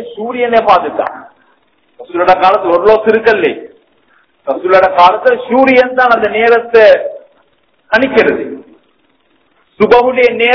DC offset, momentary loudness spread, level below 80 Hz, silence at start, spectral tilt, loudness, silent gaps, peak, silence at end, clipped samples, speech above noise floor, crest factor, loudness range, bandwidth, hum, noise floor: under 0.1%; 13 LU; -46 dBFS; 0 s; -6 dB/octave; -9 LUFS; none; 0 dBFS; 0 s; 3%; 46 dB; 10 dB; 4 LU; 5.4 kHz; none; -55 dBFS